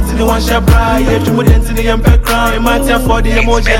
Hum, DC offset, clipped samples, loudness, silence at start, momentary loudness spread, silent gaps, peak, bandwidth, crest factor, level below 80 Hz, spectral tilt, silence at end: none; under 0.1%; under 0.1%; -11 LUFS; 0 s; 2 LU; none; 0 dBFS; 17 kHz; 10 dB; -12 dBFS; -5.5 dB/octave; 0 s